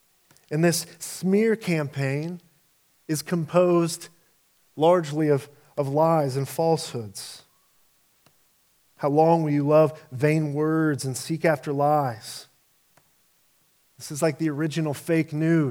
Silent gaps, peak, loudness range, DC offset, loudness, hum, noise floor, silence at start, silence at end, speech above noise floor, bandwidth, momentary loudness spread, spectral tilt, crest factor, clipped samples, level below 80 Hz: none; -6 dBFS; 5 LU; under 0.1%; -24 LUFS; none; -64 dBFS; 0.5 s; 0 s; 41 dB; 17.5 kHz; 15 LU; -6 dB/octave; 20 dB; under 0.1%; -74 dBFS